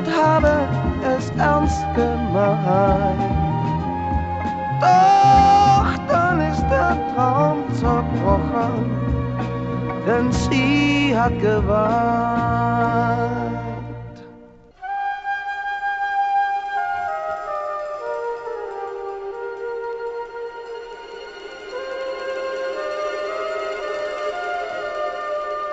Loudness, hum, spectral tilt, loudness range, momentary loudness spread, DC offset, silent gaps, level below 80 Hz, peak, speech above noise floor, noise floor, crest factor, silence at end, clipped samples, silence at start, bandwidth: -20 LUFS; none; -6.5 dB/octave; 13 LU; 13 LU; under 0.1%; none; -34 dBFS; -2 dBFS; 28 dB; -45 dBFS; 18 dB; 0 s; under 0.1%; 0 s; 8.2 kHz